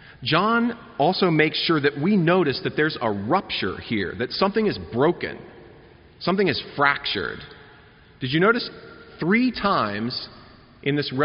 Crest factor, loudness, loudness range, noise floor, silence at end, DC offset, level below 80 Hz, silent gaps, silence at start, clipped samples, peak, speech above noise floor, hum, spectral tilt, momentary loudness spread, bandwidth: 20 dB; -22 LUFS; 4 LU; -50 dBFS; 0 s; under 0.1%; -54 dBFS; none; 0.2 s; under 0.1%; -4 dBFS; 28 dB; none; -3.5 dB/octave; 11 LU; 5.6 kHz